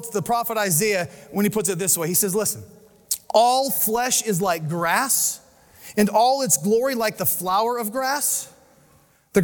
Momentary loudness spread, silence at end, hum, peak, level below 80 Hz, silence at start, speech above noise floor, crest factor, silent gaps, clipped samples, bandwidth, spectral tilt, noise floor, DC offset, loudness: 8 LU; 0 s; none; -4 dBFS; -60 dBFS; 0 s; 36 dB; 18 dB; none; under 0.1%; 19.5 kHz; -3 dB/octave; -57 dBFS; under 0.1%; -21 LUFS